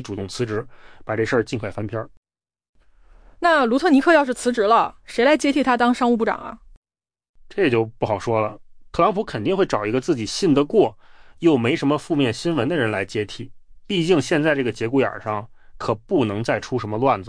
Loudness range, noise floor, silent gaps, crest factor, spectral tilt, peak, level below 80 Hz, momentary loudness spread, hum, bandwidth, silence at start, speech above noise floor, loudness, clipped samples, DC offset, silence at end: 5 LU; -50 dBFS; 2.17-2.23 s, 2.69-2.73 s, 6.77-6.82 s, 7.29-7.34 s; 16 dB; -5.5 dB/octave; -6 dBFS; -50 dBFS; 12 LU; none; 10.5 kHz; 0 s; 30 dB; -21 LUFS; under 0.1%; under 0.1%; 0 s